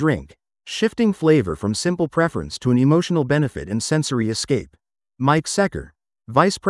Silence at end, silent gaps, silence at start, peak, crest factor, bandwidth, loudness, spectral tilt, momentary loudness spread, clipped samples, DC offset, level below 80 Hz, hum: 0 s; none; 0 s; 0 dBFS; 20 dB; 12 kHz; -20 LUFS; -5.5 dB/octave; 7 LU; under 0.1%; under 0.1%; -48 dBFS; none